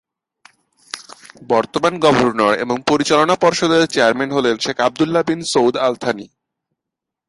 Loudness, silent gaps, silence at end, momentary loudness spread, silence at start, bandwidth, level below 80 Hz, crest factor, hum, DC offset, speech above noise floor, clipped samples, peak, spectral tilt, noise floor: -16 LUFS; none; 1.05 s; 9 LU; 0.95 s; 11.5 kHz; -56 dBFS; 18 dB; none; under 0.1%; 67 dB; under 0.1%; 0 dBFS; -4 dB/octave; -83 dBFS